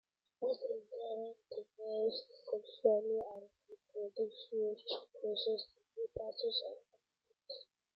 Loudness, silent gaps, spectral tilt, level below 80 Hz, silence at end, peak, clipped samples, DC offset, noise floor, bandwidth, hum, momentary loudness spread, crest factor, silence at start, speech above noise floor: -40 LUFS; none; -3 dB/octave; -78 dBFS; 0.35 s; -18 dBFS; under 0.1%; under 0.1%; -82 dBFS; 5.6 kHz; none; 15 LU; 24 dB; 0.4 s; 43 dB